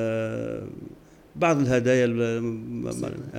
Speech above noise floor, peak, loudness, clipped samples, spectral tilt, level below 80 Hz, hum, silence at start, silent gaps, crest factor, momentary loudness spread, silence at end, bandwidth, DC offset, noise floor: 23 dB; -10 dBFS; -25 LUFS; under 0.1%; -6.5 dB/octave; -54 dBFS; none; 0 s; none; 16 dB; 19 LU; 0 s; 15.5 kHz; under 0.1%; -47 dBFS